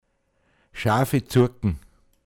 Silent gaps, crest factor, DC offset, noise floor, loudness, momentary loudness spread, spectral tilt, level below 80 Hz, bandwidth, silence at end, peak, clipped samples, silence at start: none; 18 dB; under 0.1%; -68 dBFS; -23 LUFS; 14 LU; -6.5 dB/octave; -44 dBFS; 17.5 kHz; 0.45 s; -6 dBFS; under 0.1%; 0.75 s